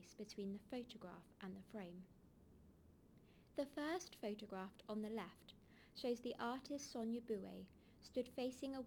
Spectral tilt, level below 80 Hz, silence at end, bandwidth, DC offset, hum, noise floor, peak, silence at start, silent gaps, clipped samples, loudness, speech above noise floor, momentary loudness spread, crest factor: -5 dB/octave; -76 dBFS; 0 s; over 20 kHz; under 0.1%; none; -68 dBFS; -32 dBFS; 0 s; none; under 0.1%; -49 LUFS; 20 dB; 23 LU; 18 dB